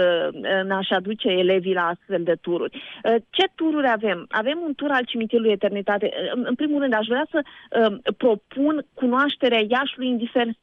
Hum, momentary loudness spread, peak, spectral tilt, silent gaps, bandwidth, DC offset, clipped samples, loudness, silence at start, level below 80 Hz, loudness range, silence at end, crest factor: none; 5 LU; -8 dBFS; -7 dB/octave; none; 7 kHz; under 0.1%; under 0.1%; -22 LUFS; 0 s; -68 dBFS; 1 LU; 0.1 s; 14 dB